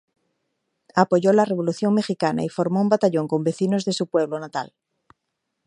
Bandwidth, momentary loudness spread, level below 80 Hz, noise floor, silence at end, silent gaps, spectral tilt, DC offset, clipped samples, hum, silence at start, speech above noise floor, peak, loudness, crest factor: 10.5 kHz; 8 LU; -68 dBFS; -79 dBFS; 1 s; none; -6.5 dB/octave; under 0.1%; under 0.1%; none; 0.95 s; 58 dB; -2 dBFS; -22 LUFS; 22 dB